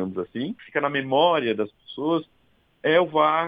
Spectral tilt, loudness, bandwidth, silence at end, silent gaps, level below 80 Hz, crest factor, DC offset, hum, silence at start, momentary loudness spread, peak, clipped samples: -8 dB/octave; -24 LUFS; 5 kHz; 0 s; none; -68 dBFS; 18 dB; under 0.1%; none; 0 s; 11 LU; -6 dBFS; under 0.1%